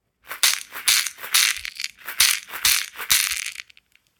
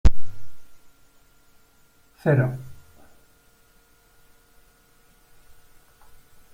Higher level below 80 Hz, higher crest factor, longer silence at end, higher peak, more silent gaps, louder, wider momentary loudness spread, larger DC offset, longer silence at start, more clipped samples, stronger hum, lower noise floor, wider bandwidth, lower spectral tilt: second, -58 dBFS vs -34 dBFS; about the same, 24 dB vs 20 dB; second, 0.55 s vs 3.8 s; about the same, 0 dBFS vs -2 dBFS; neither; first, -19 LUFS vs -24 LUFS; second, 13 LU vs 29 LU; neither; first, 0.25 s vs 0.05 s; neither; neither; about the same, -56 dBFS vs -58 dBFS; first, 19 kHz vs 16 kHz; second, 3.5 dB/octave vs -8 dB/octave